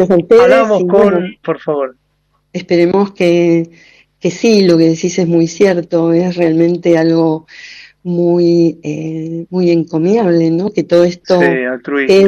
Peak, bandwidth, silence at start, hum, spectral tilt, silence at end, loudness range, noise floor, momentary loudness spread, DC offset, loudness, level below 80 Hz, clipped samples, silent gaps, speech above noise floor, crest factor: 0 dBFS; 7.6 kHz; 0 s; none; -6.5 dB/octave; 0 s; 3 LU; -60 dBFS; 12 LU; under 0.1%; -12 LUFS; -52 dBFS; under 0.1%; none; 49 dB; 12 dB